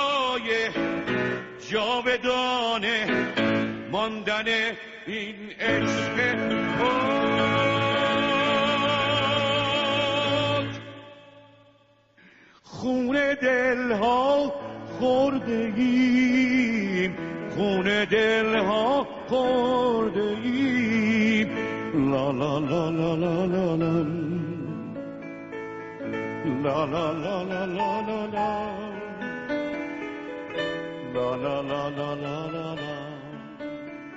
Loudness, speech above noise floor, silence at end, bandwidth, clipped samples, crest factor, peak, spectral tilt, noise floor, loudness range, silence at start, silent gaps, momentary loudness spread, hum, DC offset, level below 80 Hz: -25 LUFS; 35 dB; 0 s; 8 kHz; under 0.1%; 14 dB; -12 dBFS; -3.5 dB/octave; -60 dBFS; 7 LU; 0 s; none; 12 LU; none; under 0.1%; -56 dBFS